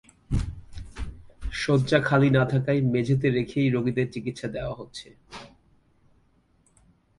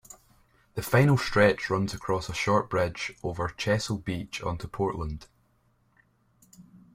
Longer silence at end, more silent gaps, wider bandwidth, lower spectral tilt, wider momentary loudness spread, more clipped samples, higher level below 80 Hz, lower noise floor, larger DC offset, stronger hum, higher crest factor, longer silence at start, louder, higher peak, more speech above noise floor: first, 1.75 s vs 0.15 s; neither; second, 11.5 kHz vs 16.5 kHz; first, -7 dB/octave vs -5.5 dB/octave; first, 22 LU vs 12 LU; neither; first, -42 dBFS vs -50 dBFS; about the same, -64 dBFS vs -67 dBFS; neither; neither; about the same, 20 dB vs 22 dB; first, 0.3 s vs 0.1 s; about the same, -25 LUFS vs -27 LUFS; about the same, -6 dBFS vs -8 dBFS; about the same, 40 dB vs 41 dB